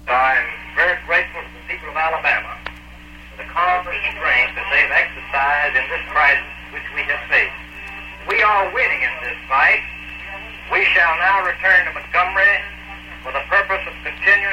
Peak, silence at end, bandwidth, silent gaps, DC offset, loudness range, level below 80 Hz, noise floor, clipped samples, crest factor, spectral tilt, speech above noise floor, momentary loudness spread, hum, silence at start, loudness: -4 dBFS; 0 s; 16 kHz; none; under 0.1%; 4 LU; -42 dBFS; -38 dBFS; under 0.1%; 16 dB; -3.5 dB/octave; 22 dB; 17 LU; 60 Hz at -40 dBFS; 0 s; -16 LUFS